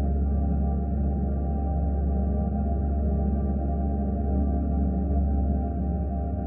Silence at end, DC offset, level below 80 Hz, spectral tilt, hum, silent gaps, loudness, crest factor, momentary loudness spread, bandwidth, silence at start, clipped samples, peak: 0 s; under 0.1%; -26 dBFS; -14.5 dB/octave; none; none; -27 LUFS; 10 dB; 2 LU; 1.9 kHz; 0 s; under 0.1%; -14 dBFS